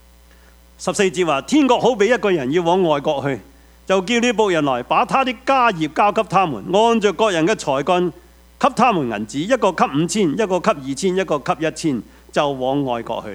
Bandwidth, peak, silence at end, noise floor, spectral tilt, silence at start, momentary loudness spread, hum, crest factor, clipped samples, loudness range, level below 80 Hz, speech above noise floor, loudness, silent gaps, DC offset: 16 kHz; 0 dBFS; 0 s; -47 dBFS; -5 dB/octave; 0.8 s; 7 LU; none; 18 dB; under 0.1%; 3 LU; -50 dBFS; 30 dB; -18 LUFS; none; under 0.1%